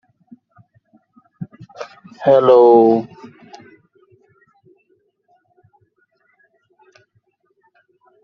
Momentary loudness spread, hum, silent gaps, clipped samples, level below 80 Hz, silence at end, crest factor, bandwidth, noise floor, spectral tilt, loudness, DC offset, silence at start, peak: 26 LU; none; none; under 0.1%; -68 dBFS; 5.2 s; 18 dB; 6.4 kHz; -64 dBFS; -6 dB/octave; -12 LUFS; under 0.1%; 1.4 s; -2 dBFS